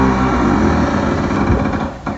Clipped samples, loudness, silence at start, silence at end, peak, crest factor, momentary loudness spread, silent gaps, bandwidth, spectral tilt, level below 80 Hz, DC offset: under 0.1%; -15 LUFS; 0 s; 0 s; 0 dBFS; 14 dB; 4 LU; none; 8 kHz; -7 dB/octave; -24 dBFS; under 0.1%